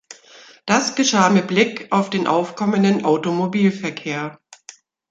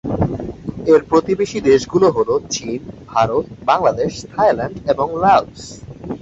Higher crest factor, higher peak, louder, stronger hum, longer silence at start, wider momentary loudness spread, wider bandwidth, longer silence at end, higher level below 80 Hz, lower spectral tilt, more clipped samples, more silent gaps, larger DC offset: about the same, 18 dB vs 16 dB; about the same, -2 dBFS vs -2 dBFS; about the same, -18 LUFS vs -17 LUFS; neither; about the same, 0.1 s vs 0.05 s; second, 11 LU vs 15 LU; about the same, 8 kHz vs 8 kHz; first, 0.75 s vs 0.05 s; second, -64 dBFS vs -42 dBFS; about the same, -4.5 dB/octave vs -5.5 dB/octave; neither; neither; neither